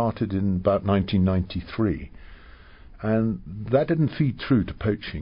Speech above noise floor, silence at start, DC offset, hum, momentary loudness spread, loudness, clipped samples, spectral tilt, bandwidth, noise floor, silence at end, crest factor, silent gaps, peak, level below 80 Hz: 23 dB; 0 s; under 0.1%; none; 8 LU; -24 LUFS; under 0.1%; -12.5 dB/octave; 5.4 kHz; -47 dBFS; 0 s; 16 dB; none; -8 dBFS; -40 dBFS